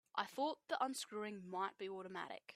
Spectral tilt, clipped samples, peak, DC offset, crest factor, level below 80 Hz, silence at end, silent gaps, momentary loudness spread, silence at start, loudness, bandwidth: -3 dB/octave; under 0.1%; -24 dBFS; under 0.1%; 22 dB; under -90 dBFS; 0 s; none; 7 LU; 0.15 s; -44 LUFS; 15.5 kHz